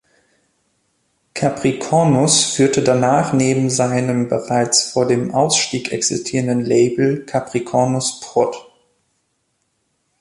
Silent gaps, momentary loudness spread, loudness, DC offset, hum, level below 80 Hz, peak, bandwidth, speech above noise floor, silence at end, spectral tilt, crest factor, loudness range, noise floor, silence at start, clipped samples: none; 7 LU; -16 LUFS; under 0.1%; none; -56 dBFS; 0 dBFS; 11.5 kHz; 52 dB; 1.6 s; -4 dB/octave; 18 dB; 4 LU; -68 dBFS; 1.35 s; under 0.1%